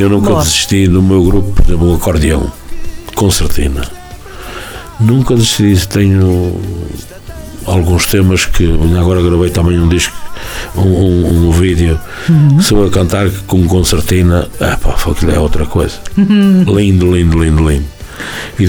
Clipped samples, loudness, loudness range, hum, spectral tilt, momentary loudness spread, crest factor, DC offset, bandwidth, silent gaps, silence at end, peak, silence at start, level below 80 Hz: under 0.1%; -11 LUFS; 3 LU; none; -5.5 dB/octave; 16 LU; 10 dB; under 0.1%; 19.5 kHz; none; 0 s; 0 dBFS; 0 s; -18 dBFS